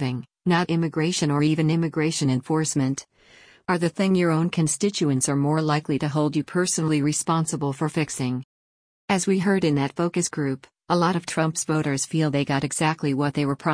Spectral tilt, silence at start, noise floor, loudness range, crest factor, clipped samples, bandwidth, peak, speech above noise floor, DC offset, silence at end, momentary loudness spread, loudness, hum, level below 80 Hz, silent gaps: -5 dB/octave; 0 s; under -90 dBFS; 2 LU; 16 dB; under 0.1%; 10.5 kHz; -8 dBFS; over 67 dB; under 0.1%; 0 s; 5 LU; -23 LUFS; none; -60 dBFS; 8.44-9.08 s